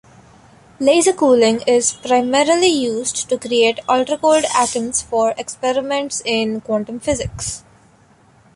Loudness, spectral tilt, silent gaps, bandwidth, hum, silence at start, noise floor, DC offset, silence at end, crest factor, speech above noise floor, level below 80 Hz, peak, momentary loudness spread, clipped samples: -17 LUFS; -3 dB/octave; none; 11.5 kHz; none; 0.8 s; -51 dBFS; under 0.1%; 0.95 s; 16 dB; 35 dB; -46 dBFS; -2 dBFS; 8 LU; under 0.1%